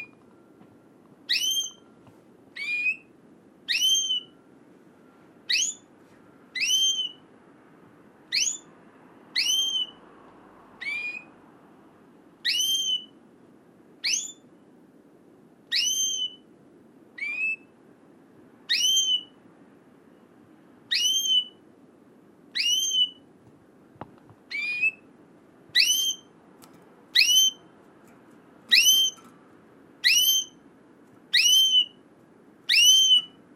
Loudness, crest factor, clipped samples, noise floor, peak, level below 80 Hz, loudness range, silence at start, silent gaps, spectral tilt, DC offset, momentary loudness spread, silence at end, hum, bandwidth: -22 LUFS; 24 dB; under 0.1%; -55 dBFS; -4 dBFS; -82 dBFS; 8 LU; 0 s; none; 3 dB/octave; under 0.1%; 18 LU; 0.3 s; none; 16 kHz